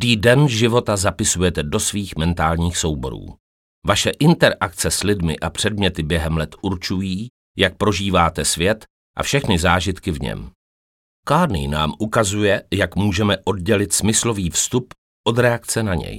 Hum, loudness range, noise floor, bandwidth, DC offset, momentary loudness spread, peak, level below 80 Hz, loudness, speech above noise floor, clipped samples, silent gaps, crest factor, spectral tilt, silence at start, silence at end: none; 2 LU; under -90 dBFS; 17 kHz; under 0.1%; 9 LU; 0 dBFS; -36 dBFS; -19 LUFS; over 71 dB; under 0.1%; 3.40-3.82 s, 7.30-7.54 s, 8.90-9.14 s, 10.55-11.23 s, 14.98-15.24 s; 18 dB; -4 dB/octave; 0 s; 0 s